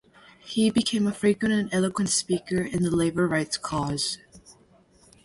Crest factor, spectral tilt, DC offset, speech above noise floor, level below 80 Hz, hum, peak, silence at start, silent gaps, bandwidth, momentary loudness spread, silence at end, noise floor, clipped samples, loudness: 16 dB; -4.5 dB/octave; under 0.1%; 33 dB; -54 dBFS; none; -10 dBFS; 0.45 s; none; 11.5 kHz; 6 LU; 0.75 s; -58 dBFS; under 0.1%; -25 LUFS